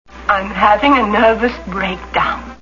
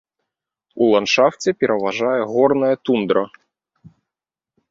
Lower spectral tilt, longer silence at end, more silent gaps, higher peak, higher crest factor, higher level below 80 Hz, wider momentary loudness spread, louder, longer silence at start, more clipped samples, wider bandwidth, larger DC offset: first, -6 dB/octave vs -4.5 dB/octave; second, 0.05 s vs 0.85 s; neither; about the same, 0 dBFS vs -2 dBFS; about the same, 14 dB vs 18 dB; first, -36 dBFS vs -62 dBFS; first, 9 LU vs 5 LU; first, -14 LUFS vs -18 LUFS; second, 0.1 s vs 0.75 s; neither; about the same, 7.4 kHz vs 7.8 kHz; neither